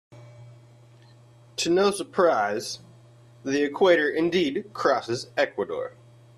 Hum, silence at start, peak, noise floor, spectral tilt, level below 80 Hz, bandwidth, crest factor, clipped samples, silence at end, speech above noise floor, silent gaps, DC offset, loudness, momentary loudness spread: none; 0.1 s; -6 dBFS; -52 dBFS; -4 dB/octave; -66 dBFS; 13.5 kHz; 20 dB; under 0.1%; 0.5 s; 29 dB; none; under 0.1%; -24 LUFS; 14 LU